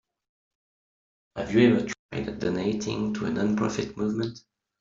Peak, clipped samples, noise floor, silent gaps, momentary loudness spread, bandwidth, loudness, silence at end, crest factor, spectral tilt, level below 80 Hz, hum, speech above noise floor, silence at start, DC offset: -6 dBFS; under 0.1%; under -90 dBFS; 1.99-2.09 s; 13 LU; 7.6 kHz; -27 LUFS; 0.4 s; 22 dB; -6 dB/octave; -56 dBFS; none; over 64 dB; 1.35 s; under 0.1%